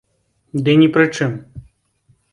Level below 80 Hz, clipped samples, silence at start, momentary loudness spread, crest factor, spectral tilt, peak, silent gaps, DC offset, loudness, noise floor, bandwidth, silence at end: -52 dBFS; under 0.1%; 0.55 s; 14 LU; 18 dB; -6.5 dB/octave; -2 dBFS; none; under 0.1%; -15 LUFS; -64 dBFS; 10.5 kHz; 0.7 s